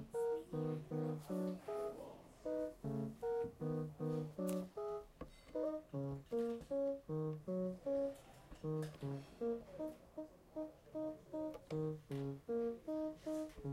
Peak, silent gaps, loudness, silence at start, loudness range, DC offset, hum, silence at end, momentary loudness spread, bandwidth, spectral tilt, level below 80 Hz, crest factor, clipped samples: -30 dBFS; none; -44 LUFS; 0 s; 4 LU; under 0.1%; none; 0 s; 8 LU; 16 kHz; -8 dB/octave; -68 dBFS; 14 dB; under 0.1%